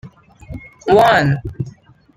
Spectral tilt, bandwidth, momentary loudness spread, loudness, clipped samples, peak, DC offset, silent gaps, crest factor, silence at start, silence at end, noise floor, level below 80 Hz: -6.5 dB/octave; 16 kHz; 23 LU; -14 LUFS; under 0.1%; -2 dBFS; under 0.1%; none; 16 dB; 0.05 s; 0.45 s; -37 dBFS; -42 dBFS